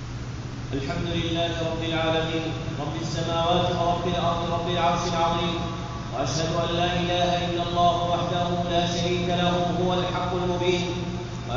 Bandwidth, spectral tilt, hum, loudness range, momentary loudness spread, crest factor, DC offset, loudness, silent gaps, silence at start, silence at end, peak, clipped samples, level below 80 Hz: 7.4 kHz; -4.5 dB/octave; none; 2 LU; 8 LU; 16 dB; 0.1%; -25 LUFS; none; 0 s; 0 s; -8 dBFS; under 0.1%; -40 dBFS